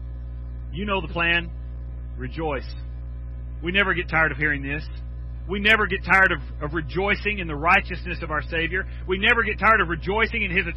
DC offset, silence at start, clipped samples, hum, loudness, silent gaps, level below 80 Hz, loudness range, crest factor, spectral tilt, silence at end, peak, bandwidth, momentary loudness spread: under 0.1%; 0 s; under 0.1%; 60 Hz at -35 dBFS; -22 LUFS; none; -34 dBFS; 6 LU; 18 dB; -6.5 dB/octave; 0 s; -6 dBFS; 9 kHz; 18 LU